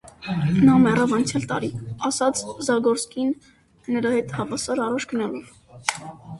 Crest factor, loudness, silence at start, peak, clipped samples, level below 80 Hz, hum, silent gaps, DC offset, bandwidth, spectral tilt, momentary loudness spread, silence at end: 22 dB; -22 LUFS; 0.05 s; 0 dBFS; under 0.1%; -54 dBFS; none; none; under 0.1%; 11.5 kHz; -5.5 dB/octave; 13 LU; 0 s